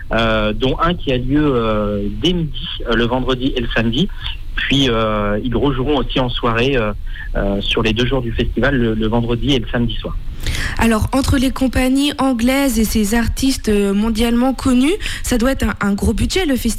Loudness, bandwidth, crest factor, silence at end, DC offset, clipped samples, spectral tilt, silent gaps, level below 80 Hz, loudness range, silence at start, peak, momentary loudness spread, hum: -17 LUFS; 16 kHz; 12 dB; 0 s; under 0.1%; under 0.1%; -5 dB/octave; none; -24 dBFS; 2 LU; 0 s; -4 dBFS; 6 LU; none